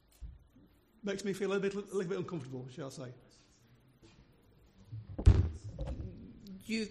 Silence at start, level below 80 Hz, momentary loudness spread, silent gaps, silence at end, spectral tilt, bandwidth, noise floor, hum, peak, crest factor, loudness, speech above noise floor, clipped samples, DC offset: 0.2 s; -42 dBFS; 22 LU; none; 0 s; -7 dB/octave; 12.5 kHz; -65 dBFS; none; -10 dBFS; 26 dB; -36 LUFS; 27 dB; under 0.1%; under 0.1%